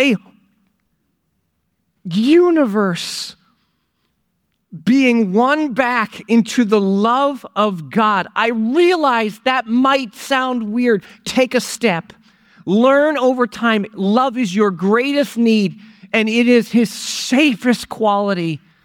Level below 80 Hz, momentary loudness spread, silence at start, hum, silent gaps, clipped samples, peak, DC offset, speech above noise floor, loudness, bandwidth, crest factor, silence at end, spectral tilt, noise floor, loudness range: -62 dBFS; 7 LU; 0 s; none; none; under 0.1%; -2 dBFS; under 0.1%; 53 dB; -16 LUFS; 16.5 kHz; 14 dB; 0.25 s; -5 dB/octave; -68 dBFS; 3 LU